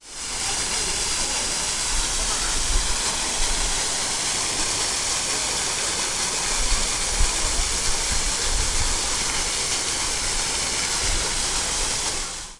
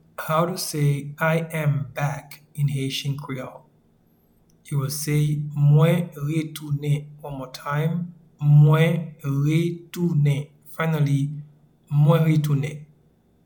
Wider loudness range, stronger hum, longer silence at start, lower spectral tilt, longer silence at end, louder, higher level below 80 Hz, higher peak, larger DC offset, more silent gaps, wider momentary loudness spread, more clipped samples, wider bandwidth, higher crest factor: second, 0 LU vs 6 LU; neither; second, 0.05 s vs 0.2 s; second, -0.5 dB/octave vs -7 dB/octave; second, 0 s vs 0.6 s; about the same, -22 LUFS vs -23 LUFS; first, -30 dBFS vs -58 dBFS; about the same, -6 dBFS vs -6 dBFS; neither; neither; second, 1 LU vs 15 LU; neither; second, 12 kHz vs 19 kHz; about the same, 18 dB vs 18 dB